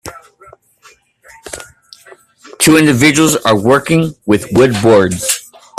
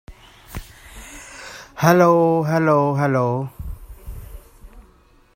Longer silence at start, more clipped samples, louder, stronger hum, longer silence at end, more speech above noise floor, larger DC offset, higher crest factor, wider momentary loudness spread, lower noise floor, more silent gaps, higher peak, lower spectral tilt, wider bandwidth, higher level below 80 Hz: about the same, 0.05 s vs 0.1 s; neither; first, -11 LUFS vs -17 LUFS; neither; second, 0.4 s vs 0.55 s; about the same, 37 dB vs 37 dB; neither; second, 14 dB vs 20 dB; second, 20 LU vs 24 LU; second, -47 dBFS vs -53 dBFS; neither; about the same, 0 dBFS vs -2 dBFS; second, -4.5 dB/octave vs -7 dB/octave; about the same, 15.5 kHz vs 16 kHz; about the same, -44 dBFS vs -42 dBFS